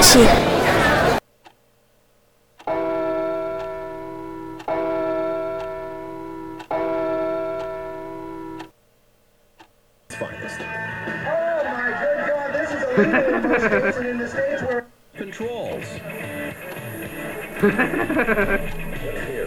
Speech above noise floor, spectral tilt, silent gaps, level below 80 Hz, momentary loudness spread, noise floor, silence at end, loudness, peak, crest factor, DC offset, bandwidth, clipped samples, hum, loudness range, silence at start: 44 dB; -3.5 dB/octave; none; -38 dBFS; 16 LU; -59 dBFS; 0 s; -22 LUFS; -2 dBFS; 20 dB; under 0.1%; over 20 kHz; under 0.1%; none; 9 LU; 0 s